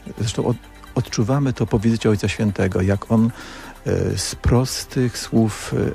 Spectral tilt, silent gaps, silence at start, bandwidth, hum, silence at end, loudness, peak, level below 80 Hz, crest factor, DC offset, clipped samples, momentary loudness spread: -6 dB/octave; none; 0 s; 15 kHz; none; 0 s; -21 LUFS; -4 dBFS; -36 dBFS; 16 dB; under 0.1%; under 0.1%; 7 LU